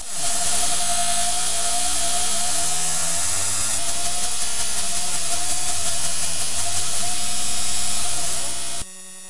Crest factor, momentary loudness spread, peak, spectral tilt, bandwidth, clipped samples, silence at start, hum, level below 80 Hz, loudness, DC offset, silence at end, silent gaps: 14 dB; 3 LU; -6 dBFS; 0 dB/octave; 11.5 kHz; under 0.1%; 0 s; none; -46 dBFS; -21 LUFS; 10%; 0 s; none